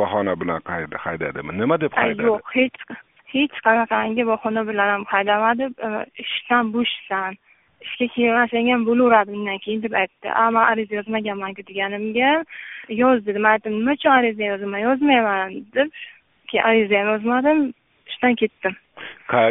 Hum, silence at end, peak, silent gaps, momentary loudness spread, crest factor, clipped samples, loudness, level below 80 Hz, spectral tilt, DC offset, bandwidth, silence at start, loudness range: none; 0 s; 0 dBFS; none; 11 LU; 20 dB; under 0.1%; -20 LUFS; -60 dBFS; 0 dB/octave; under 0.1%; 3.9 kHz; 0 s; 3 LU